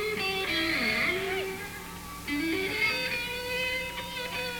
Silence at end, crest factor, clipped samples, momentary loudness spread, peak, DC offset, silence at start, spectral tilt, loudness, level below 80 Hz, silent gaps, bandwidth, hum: 0 s; 14 dB; under 0.1%; 11 LU; -16 dBFS; under 0.1%; 0 s; -3 dB/octave; -29 LUFS; -52 dBFS; none; over 20 kHz; none